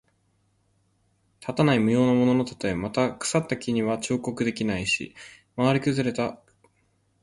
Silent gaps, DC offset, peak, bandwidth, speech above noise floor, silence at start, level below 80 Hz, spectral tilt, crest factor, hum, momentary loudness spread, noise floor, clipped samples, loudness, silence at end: none; under 0.1%; -8 dBFS; 11.5 kHz; 44 dB; 1.4 s; -56 dBFS; -5.5 dB/octave; 18 dB; none; 11 LU; -68 dBFS; under 0.1%; -25 LUFS; 0.9 s